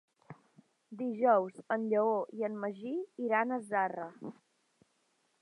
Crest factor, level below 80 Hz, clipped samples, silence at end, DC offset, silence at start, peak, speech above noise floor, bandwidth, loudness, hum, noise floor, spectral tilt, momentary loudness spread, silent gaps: 20 dB; under -90 dBFS; under 0.1%; 1.1 s; under 0.1%; 0.3 s; -14 dBFS; 43 dB; 11 kHz; -33 LUFS; none; -76 dBFS; -7.5 dB/octave; 15 LU; none